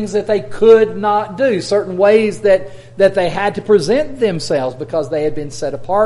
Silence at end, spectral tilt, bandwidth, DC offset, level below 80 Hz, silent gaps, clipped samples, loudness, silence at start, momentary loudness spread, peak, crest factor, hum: 0 s; -5.5 dB/octave; 11.5 kHz; under 0.1%; -44 dBFS; none; under 0.1%; -15 LUFS; 0 s; 10 LU; 0 dBFS; 14 dB; none